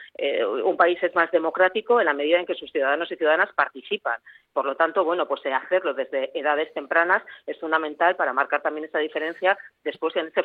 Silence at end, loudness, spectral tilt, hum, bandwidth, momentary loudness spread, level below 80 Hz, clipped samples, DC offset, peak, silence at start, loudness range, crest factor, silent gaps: 0 s; -23 LUFS; -6 dB/octave; none; 4.6 kHz; 7 LU; -76 dBFS; under 0.1%; under 0.1%; -6 dBFS; 0 s; 3 LU; 18 dB; none